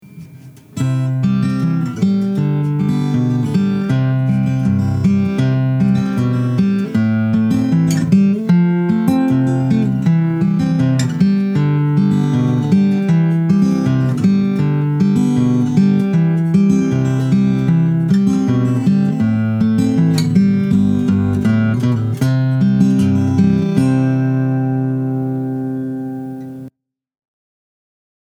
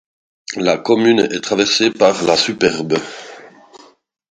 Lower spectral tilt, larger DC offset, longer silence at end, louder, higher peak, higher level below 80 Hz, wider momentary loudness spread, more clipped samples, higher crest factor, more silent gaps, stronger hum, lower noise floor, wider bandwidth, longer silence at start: first, -8.5 dB/octave vs -3.5 dB/octave; neither; first, 1.6 s vs 0.8 s; about the same, -15 LUFS vs -15 LUFS; about the same, 0 dBFS vs 0 dBFS; first, -48 dBFS vs -56 dBFS; second, 4 LU vs 18 LU; neither; about the same, 14 dB vs 16 dB; neither; neither; about the same, -44 dBFS vs -45 dBFS; first, 12 kHz vs 9.4 kHz; second, 0.1 s vs 0.5 s